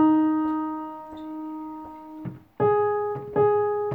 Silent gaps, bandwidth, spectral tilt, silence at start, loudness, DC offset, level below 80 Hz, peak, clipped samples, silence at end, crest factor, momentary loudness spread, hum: none; 3.9 kHz; -10.5 dB/octave; 0 s; -25 LUFS; under 0.1%; -62 dBFS; -10 dBFS; under 0.1%; 0 s; 14 dB; 17 LU; none